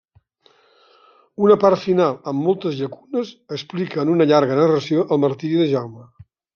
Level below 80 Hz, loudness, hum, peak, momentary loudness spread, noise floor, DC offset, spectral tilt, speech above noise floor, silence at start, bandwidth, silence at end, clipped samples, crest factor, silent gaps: -66 dBFS; -19 LUFS; none; -2 dBFS; 13 LU; -57 dBFS; under 0.1%; -7.5 dB/octave; 39 dB; 1.4 s; 7 kHz; 0.5 s; under 0.1%; 18 dB; none